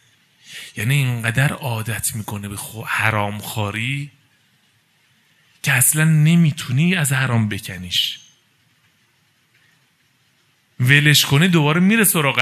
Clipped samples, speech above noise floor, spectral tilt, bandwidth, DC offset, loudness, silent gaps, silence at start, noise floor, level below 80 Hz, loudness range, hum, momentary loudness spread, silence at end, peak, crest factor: under 0.1%; 43 dB; -4 dB/octave; 14 kHz; under 0.1%; -17 LUFS; none; 0.5 s; -61 dBFS; -58 dBFS; 7 LU; none; 15 LU; 0 s; 0 dBFS; 20 dB